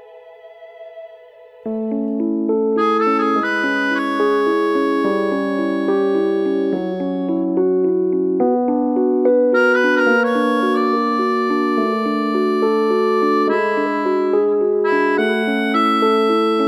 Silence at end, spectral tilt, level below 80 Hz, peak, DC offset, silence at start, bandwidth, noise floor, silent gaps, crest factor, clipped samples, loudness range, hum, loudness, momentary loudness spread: 0 s; -6 dB/octave; -62 dBFS; -4 dBFS; under 0.1%; 0 s; 12.5 kHz; -42 dBFS; none; 14 dB; under 0.1%; 3 LU; none; -17 LUFS; 6 LU